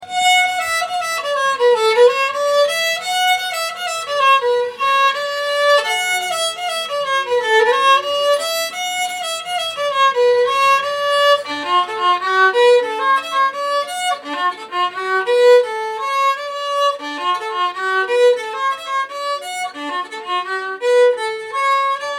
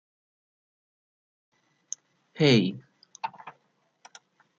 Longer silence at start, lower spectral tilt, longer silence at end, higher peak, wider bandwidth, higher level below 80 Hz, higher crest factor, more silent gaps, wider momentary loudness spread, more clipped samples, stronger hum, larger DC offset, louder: second, 0 s vs 2.4 s; second, 0 dB/octave vs -5 dB/octave; second, 0 s vs 1.1 s; first, -2 dBFS vs -8 dBFS; first, 17 kHz vs 8 kHz; about the same, -72 dBFS vs -70 dBFS; second, 16 dB vs 24 dB; neither; second, 9 LU vs 26 LU; neither; neither; neither; first, -16 LUFS vs -25 LUFS